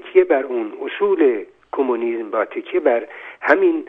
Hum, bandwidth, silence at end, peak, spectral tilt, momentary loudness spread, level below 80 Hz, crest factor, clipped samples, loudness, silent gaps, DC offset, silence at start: none; 5.4 kHz; 0 s; 0 dBFS; -6.5 dB/octave; 11 LU; -68 dBFS; 18 dB; under 0.1%; -19 LUFS; none; under 0.1%; 0 s